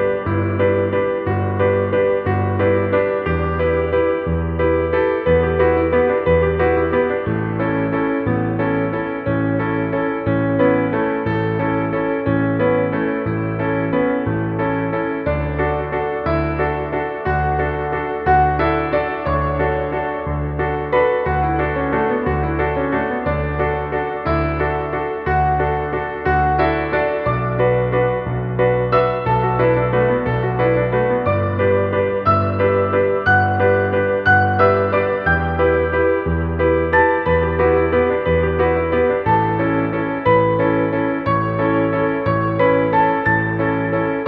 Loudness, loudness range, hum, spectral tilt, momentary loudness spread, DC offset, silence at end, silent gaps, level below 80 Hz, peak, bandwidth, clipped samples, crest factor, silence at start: -18 LUFS; 4 LU; none; -10.5 dB/octave; 6 LU; under 0.1%; 0 s; none; -32 dBFS; -2 dBFS; 5 kHz; under 0.1%; 16 dB; 0 s